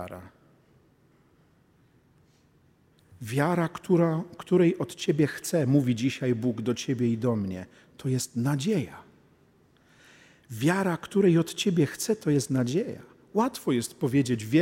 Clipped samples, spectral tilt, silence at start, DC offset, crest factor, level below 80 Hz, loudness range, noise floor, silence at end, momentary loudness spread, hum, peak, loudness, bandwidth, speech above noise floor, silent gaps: under 0.1%; -6 dB/octave; 0 s; under 0.1%; 18 dB; -68 dBFS; 6 LU; -63 dBFS; 0 s; 11 LU; none; -10 dBFS; -27 LUFS; 16 kHz; 37 dB; none